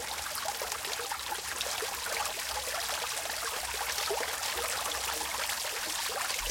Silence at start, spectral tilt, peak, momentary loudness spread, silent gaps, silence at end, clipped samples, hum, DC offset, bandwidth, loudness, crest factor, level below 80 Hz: 0 s; 0.5 dB/octave; -14 dBFS; 3 LU; none; 0 s; under 0.1%; none; under 0.1%; 17 kHz; -32 LUFS; 20 dB; -56 dBFS